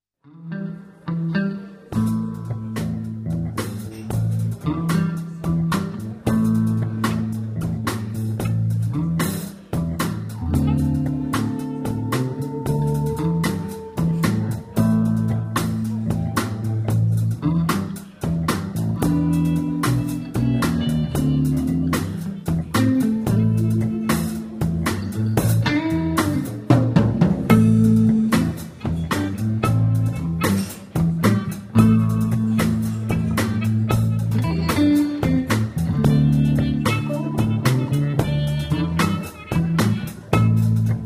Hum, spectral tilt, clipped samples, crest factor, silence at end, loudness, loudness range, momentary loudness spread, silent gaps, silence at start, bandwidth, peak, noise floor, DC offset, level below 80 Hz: none; -7 dB/octave; under 0.1%; 20 dB; 0 s; -21 LUFS; 6 LU; 9 LU; none; 0.35 s; 16 kHz; 0 dBFS; -41 dBFS; under 0.1%; -38 dBFS